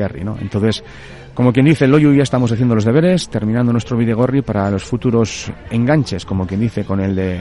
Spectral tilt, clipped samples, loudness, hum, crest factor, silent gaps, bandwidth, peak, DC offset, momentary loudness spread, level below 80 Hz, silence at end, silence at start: -7 dB/octave; under 0.1%; -16 LUFS; none; 14 dB; none; 11.5 kHz; 0 dBFS; under 0.1%; 11 LU; -42 dBFS; 0 s; 0 s